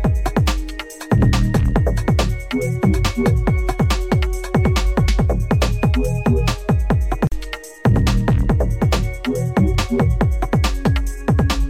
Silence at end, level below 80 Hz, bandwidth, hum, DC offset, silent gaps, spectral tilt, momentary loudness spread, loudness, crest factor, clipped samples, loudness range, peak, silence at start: 0 s; -22 dBFS; 16 kHz; none; under 0.1%; none; -6.5 dB/octave; 4 LU; -19 LUFS; 14 dB; under 0.1%; 1 LU; -2 dBFS; 0 s